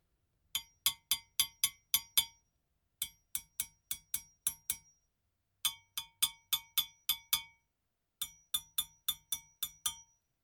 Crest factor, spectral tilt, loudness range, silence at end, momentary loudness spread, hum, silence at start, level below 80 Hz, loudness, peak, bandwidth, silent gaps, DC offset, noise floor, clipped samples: 28 dB; 3 dB/octave; 5 LU; 0.4 s; 11 LU; none; 0.55 s; -72 dBFS; -36 LUFS; -12 dBFS; 19.5 kHz; none; under 0.1%; -85 dBFS; under 0.1%